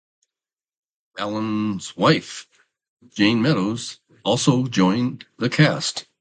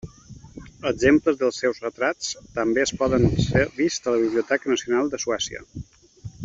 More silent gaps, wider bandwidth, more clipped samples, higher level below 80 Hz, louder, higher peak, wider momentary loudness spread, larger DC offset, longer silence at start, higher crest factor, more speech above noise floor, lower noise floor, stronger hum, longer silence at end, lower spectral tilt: first, 2.89-2.97 s vs none; first, 9.4 kHz vs 7.8 kHz; neither; second, -60 dBFS vs -44 dBFS; about the same, -21 LUFS vs -23 LUFS; about the same, -2 dBFS vs -4 dBFS; second, 14 LU vs 21 LU; neither; first, 1.15 s vs 0.05 s; about the same, 20 dB vs 20 dB; first, over 69 dB vs 23 dB; first, under -90 dBFS vs -45 dBFS; neither; first, 0.2 s vs 0 s; about the same, -5 dB/octave vs -5 dB/octave